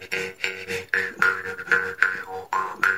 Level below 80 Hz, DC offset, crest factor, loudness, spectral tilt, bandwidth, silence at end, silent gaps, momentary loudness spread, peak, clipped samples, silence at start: -66 dBFS; 0.1%; 24 dB; -24 LUFS; -2.5 dB/octave; 16 kHz; 0 s; none; 8 LU; -2 dBFS; under 0.1%; 0 s